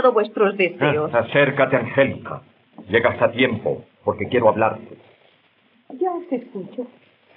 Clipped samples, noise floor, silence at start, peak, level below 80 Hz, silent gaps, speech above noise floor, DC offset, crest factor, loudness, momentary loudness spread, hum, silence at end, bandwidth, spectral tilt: under 0.1%; -59 dBFS; 0 s; -2 dBFS; -74 dBFS; none; 39 dB; under 0.1%; 18 dB; -20 LUFS; 16 LU; none; 0.5 s; 4.7 kHz; -4 dB/octave